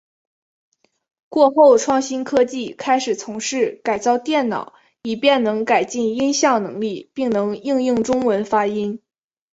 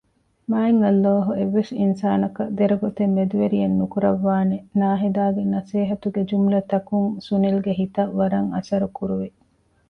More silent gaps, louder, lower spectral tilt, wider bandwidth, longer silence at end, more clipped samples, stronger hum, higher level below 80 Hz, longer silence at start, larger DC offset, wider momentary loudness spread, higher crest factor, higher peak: neither; about the same, -19 LUFS vs -21 LUFS; second, -4 dB/octave vs -9.5 dB/octave; first, 8 kHz vs 6.4 kHz; about the same, 0.55 s vs 0.6 s; neither; neither; about the same, -60 dBFS vs -56 dBFS; first, 1.3 s vs 0.5 s; neither; first, 10 LU vs 6 LU; about the same, 18 dB vs 14 dB; first, -2 dBFS vs -6 dBFS